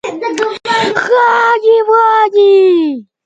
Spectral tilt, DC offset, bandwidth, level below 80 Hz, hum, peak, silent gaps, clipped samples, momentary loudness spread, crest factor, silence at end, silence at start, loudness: -4 dB/octave; under 0.1%; 9 kHz; -64 dBFS; none; 0 dBFS; none; under 0.1%; 9 LU; 10 dB; 0.25 s; 0.05 s; -10 LUFS